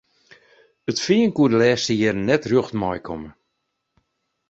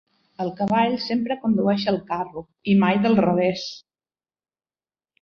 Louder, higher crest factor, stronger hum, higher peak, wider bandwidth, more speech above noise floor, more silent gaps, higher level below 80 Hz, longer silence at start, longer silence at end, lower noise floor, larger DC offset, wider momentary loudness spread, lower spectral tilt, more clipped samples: about the same, -20 LUFS vs -22 LUFS; about the same, 18 dB vs 16 dB; neither; about the same, -4 dBFS vs -6 dBFS; first, 8 kHz vs 6.6 kHz; second, 56 dB vs over 69 dB; neither; first, -54 dBFS vs -60 dBFS; first, 0.9 s vs 0.4 s; second, 1.2 s vs 1.45 s; second, -76 dBFS vs under -90 dBFS; neither; first, 16 LU vs 13 LU; second, -5 dB/octave vs -7 dB/octave; neither